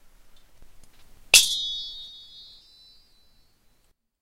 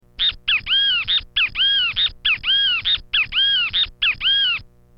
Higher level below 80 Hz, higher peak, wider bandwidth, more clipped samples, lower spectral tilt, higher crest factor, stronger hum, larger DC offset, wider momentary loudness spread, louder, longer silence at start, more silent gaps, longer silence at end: second, -54 dBFS vs -44 dBFS; first, 0 dBFS vs -8 dBFS; first, 16 kHz vs 6.8 kHz; neither; second, 3 dB/octave vs -2 dB/octave; first, 30 dB vs 12 dB; neither; neither; first, 27 LU vs 4 LU; about the same, -19 LUFS vs -17 LUFS; first, 0.35 s vs 0.2 s; neither; first, 2.05 s vs 0.35 s